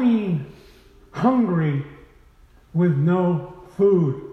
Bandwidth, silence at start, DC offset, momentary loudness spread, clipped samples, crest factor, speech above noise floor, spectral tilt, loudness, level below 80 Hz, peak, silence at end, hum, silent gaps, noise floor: 6.2 kHz; 0 s; under 0.1%; 18 LU; under 0.1%; 16 dB; 32 dB; -10 dB/octave; -21 LUFS; -54 dBFS; -6 dBFS; 0 s; none; none; -52 dBFS